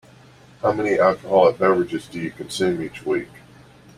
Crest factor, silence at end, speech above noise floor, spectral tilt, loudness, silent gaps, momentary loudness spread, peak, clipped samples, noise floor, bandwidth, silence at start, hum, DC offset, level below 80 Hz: 20 dB; 0.75 s; 28 dB; -5.5 dB/octave; -21 LUFS; none; 12 LU; -2 dBFS; under 0.1%; -48 dBFS; 14 kHz; 0.65 s; none; under 0.1%; -56 dBFS